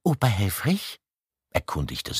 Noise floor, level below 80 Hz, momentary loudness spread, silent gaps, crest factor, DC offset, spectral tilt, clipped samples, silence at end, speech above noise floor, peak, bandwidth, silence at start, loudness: -74 dBFS; -44 dBFS; 11 LU; none; 20 dB; under 0.1%; -5 dB/octave; under 0.1%; 0 s; 48 dB; -6 dBFS; 15.5 kHz; 0.05 s; -26 LUFS